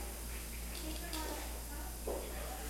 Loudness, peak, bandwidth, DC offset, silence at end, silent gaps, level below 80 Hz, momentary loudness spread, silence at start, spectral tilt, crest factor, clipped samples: -43 LUFS; -26 dBFS; 16 kHz; under 0.1%; 0 s; none; -46 dBFS; 3 LU; 0 s; -3.5 dB/octave; 16 dB; under 0.1%